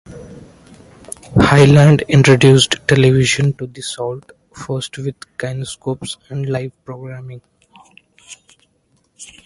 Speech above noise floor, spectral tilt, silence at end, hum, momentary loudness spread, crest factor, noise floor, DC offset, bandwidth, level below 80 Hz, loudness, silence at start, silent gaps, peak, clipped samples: 47 dB; -5.5 dB/octave; 0.2 s; none; 24 LU; 16 dB; -61 dBFS; under 0.1%; 11.5 kHz; -42 dBFS; -14 LUFS; 0.1 s; none; 0 dBFS; under 0.1%